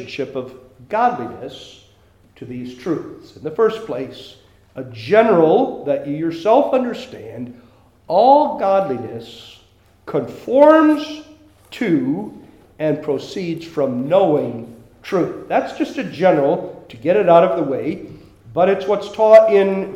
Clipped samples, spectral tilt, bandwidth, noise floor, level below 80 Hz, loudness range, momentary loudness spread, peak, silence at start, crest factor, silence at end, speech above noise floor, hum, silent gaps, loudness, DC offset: under 0.1%; -7 dB/octave; 12 kHz; -52 dBFS; -58 dBFS; 9 LU; 21 LU; 0 dBFS; 0 s; 18 dB; 0 s; 35 dB; none; none; -17 LUFS; under 0.1%